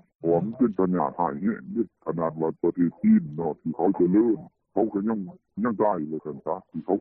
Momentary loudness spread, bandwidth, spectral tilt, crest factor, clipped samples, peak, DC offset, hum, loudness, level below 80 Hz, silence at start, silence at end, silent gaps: 11 LU; 2.6 kHz; -13.5 dB/octave; 16 dB; under 0.1%; -10 dBFS; under 0.1%; none; -26 LUFS; -64 dBFS; 0.25 s; 0 s; none